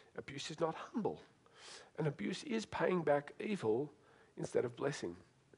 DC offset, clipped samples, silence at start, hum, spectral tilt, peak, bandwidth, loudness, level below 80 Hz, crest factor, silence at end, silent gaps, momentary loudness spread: under 0.1%; under 0.1%; 0.15 s; none; -5.5 dB/octave; -20 dBFS; 11 kHz; -40 LUFS; -76 dBFS; 20 dB; 0.35 s; none; 17 LU